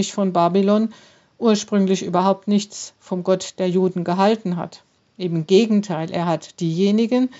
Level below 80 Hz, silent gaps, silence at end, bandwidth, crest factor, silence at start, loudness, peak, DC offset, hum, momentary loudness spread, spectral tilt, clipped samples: -72 dBFS; none; 0 s; 8 kHz; 16 dB; 0 s; -20 LUFS; -4 dBFS; under 0.1%; none; 10 LU; -6 dB/octave; under 0.1%